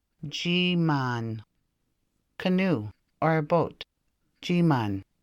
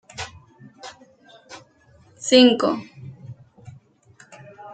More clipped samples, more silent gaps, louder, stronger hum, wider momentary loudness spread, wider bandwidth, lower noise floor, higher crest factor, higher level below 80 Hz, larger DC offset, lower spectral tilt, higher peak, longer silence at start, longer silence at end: neither; neither; second, -27 LUFS vs -17 LUFS; neither; second, 17 LU vs 29 LU; second, 7.8 kHz vs 9.2 kHz; first, -75 dBFS vs -55 dBFS; second, 16 dB vs 24 dB; about the same, -64 dBFS vs -64 dBFS; neither; first, -6.5 dB/octave vs -3.5 dB/octave; second, -12 dBFS vs -2 dBFS; about the same, 0.2 s vs 0.2 s; first, 0.2 s vs 0 s